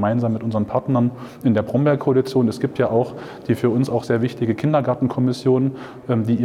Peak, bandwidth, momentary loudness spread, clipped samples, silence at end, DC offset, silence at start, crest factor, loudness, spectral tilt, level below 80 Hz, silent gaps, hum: -6 dBFS; 13.5 kHz; 6 LU; under 0.1%; 0 s; under 0.1%; 0 s; 12 dB; -20 LUFS; -8.5 dB/octave; -58 dBFS; none; none